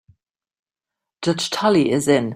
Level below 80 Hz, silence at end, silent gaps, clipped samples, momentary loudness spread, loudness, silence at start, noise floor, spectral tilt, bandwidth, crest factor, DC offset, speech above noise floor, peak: -60 dBFS; 0 s; none; under 0.1%; 7 LU; -19 LUFS; 1.2 s; -85 dBFS; -5 dB/octave; 16 kHz; 18 dB; under 0.1%; 68 dB; -2 dBFS